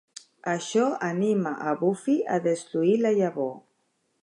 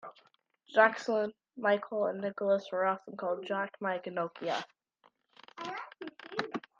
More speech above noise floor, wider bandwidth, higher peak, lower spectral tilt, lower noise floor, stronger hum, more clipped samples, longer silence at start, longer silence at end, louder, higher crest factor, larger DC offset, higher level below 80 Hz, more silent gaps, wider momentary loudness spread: first, 48 dB vs 39 dB; first, 10.5 kHz vs 7.6 kHz; about the same, -12 dBFS vs -10 dBFS; about the same, -6 dB/octave vs -5 dB/octave; about the same, -73 dBFS vs -70 dBFS; neither; neither; first, 0.45 s vs 0.05 s; first, 0.65 s vs 0.2 s; first, -26 LUFS vs -33 LUFS; second, 14 dB vs 24 dB; neither; first, -80 dBFS vs -86 dBFS; neither; second, 9 LU vs 17 LU